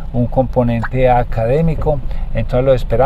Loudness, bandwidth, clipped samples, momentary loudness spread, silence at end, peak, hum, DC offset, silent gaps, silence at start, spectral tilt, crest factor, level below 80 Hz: -16 LUFS; 5.2 kHz; under 0.1%; 7 LU; 0 s; 0 dBFS; none; under 0.1%; none; 0 s; -9 dB/octave; 14 dB; -20 dBFS